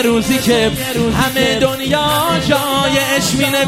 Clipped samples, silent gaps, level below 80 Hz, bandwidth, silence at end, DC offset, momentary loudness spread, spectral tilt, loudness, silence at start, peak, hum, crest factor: under 0.1%; none; -36 dBFS; 16 kHz; 0 s; under 0.1%; 2 LU; -4 dB/octave; -14 LUFS; 0 s; 0 dBFS; none; 14 dB